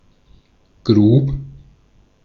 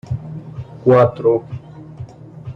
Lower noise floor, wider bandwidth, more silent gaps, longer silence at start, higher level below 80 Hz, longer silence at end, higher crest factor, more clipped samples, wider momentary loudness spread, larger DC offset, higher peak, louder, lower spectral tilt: first, -54 dBFS vs -35 dBFS; about the same, 6.4 kHz vs 7 kHz; neither; first, 0.85 s vs 0.05 s; first, -38 dBFS vs -48 dBFS; first, 0.75 s vs 0 s; about the same, 18 dB vs 16 dB; neither; second, 18 LU vs 23 LU; neither; about the same, -2 dBFS vs -2 dBFS; about the same, -15 LUFS vs -16 LUFS; about the same, -10 dB/octave vs -9.5 dB/octave